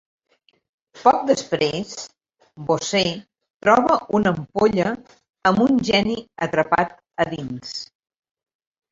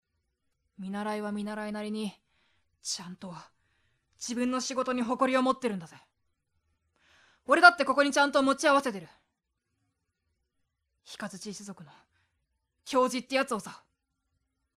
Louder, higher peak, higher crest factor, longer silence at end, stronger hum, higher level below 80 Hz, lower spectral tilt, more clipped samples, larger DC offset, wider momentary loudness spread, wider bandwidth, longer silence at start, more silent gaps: first, -20 LUFS vs -27 LUFS; about the same, -2 dBFS vs -4 dBFS; second, 20 dB vs 28 dB; about the same, 1.05 s vs 1 s; neither; first, -54 dBFS vs -72 dBFS; first, -5 dB/octave vs -3.5 dB/octave; neither; neither; second, 16 LU vs 20 LU; second, 7.8 kHz vs 14 kHz; first, 0.95 s vs 0.8 s; first, 3.50-3.60 s, 5.30-5.34 s vs none